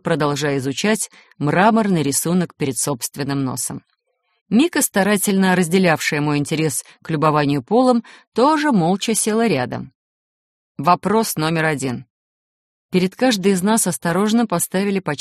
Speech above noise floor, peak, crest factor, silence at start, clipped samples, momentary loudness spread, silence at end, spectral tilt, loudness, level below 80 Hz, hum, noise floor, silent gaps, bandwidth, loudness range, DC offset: 51 dB; -2 dBFS; 18 dB; 0.05 s; under 0.1%; 8 LU; 0.05 s; -4.5 dB/octave; -18 LUFS; -58 dBFS; none; -69 dBFS; 4.41-4.46 s, 8.27-8.32 s, 9.95-10.75 s, 12.10-12.89 s; 15 kHz; 3 LU; under 0.1%